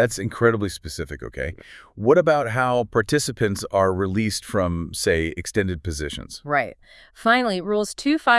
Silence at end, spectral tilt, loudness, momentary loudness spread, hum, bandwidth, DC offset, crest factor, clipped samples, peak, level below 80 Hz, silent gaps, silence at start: 0 s; -5 dB/octave; -22 LUFS; 13 LU; none; 12 kHz; under 0.1%; 18 dB; under 0.1%; -4 dBFS; -46 dBFS; none; 0 s